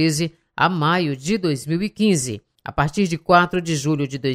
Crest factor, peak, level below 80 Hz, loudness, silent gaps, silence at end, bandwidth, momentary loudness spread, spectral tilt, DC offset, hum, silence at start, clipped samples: 20 dB; 0 dBFS; -46 dBFS; -20 LUFS; none; 0 s; 15.5 kHz; 8 LU; -5 dB/octave; under 0.1%; none; 0 s; under 0.1%